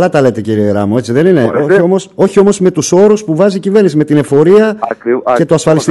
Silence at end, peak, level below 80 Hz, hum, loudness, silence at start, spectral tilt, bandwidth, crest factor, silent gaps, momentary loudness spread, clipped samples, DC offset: 0 s; 0 dBFS; -50 dBFS; none; -9 LUFS; 0 s; -6.5 dB/octave; 12 kHz; 8 dB; none; 5 LU; 1%; under 0.1%